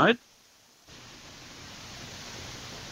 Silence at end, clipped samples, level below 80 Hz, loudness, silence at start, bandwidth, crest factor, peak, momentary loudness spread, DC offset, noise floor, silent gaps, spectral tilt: 0 s; under 0.1%; -60 dBFS; -35 LUFS; 0 s; 16 kHz; 26 dB; -6 dBFS; 22 LU; under 0.1%; -59 dBFS; none; -4 dB/octave